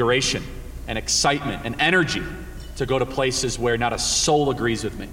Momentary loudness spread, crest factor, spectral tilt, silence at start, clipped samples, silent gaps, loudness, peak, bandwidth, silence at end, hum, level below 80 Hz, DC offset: 13 LU; 16 dB; -3 dB/octave; 0 s; under 0.1%; none; -21 LUFS; -6 dBFS; 16.5 kHz; 0 s; none; -38 dBFS; under 0.1%